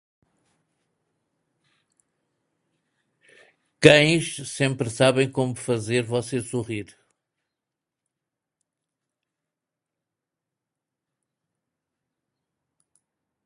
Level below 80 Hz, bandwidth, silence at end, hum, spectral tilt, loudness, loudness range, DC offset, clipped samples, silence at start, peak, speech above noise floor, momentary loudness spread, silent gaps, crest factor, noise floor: -62 dBFS; 11.5 kHz; 6.6 s; none; -4.5 dB/octave; -21 LUFS; 13 LU; under 0.1%; under 0.1%; 3.8 s; 0 dBFS; 65 dB; 15 LU; none; 28 dB; -86 dBFS